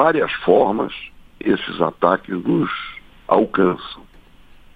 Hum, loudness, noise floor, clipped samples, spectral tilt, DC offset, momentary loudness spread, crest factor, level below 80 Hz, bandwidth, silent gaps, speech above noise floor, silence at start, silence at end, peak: none; -19 LUFS; -45 dBFS; under 0.1%; -8.5 dB/octave; under 0.1%; 18 LU; 20 dB; -50 dBFS; 4.9 kHz; none; 27 dB; 0 s; 0.75 s; 0 dBFS